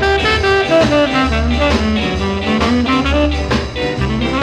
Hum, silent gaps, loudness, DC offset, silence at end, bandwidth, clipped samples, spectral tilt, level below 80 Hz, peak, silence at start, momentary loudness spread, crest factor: none; none; -14 LUFS; under 0.1%; 0 s; 11 kHz; under 0.1%; -5.5 dB/octave; -22 dBFS; -2 dBFS; 0 s; 6 LU; 12 dB